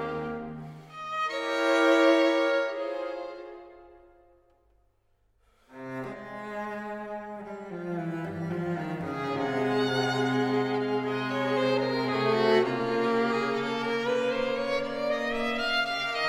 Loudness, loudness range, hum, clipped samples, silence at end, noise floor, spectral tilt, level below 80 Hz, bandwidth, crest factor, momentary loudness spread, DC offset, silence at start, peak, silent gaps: -28 LUFS; 14 LU; none; under 0.1%; 0 s; -68 dBFS; -5.5 dB/octave; -60 dBFS; 15.5 kHz; 20 dB; 15 LU; under 0.1%; 0 s; -10 dBFS; none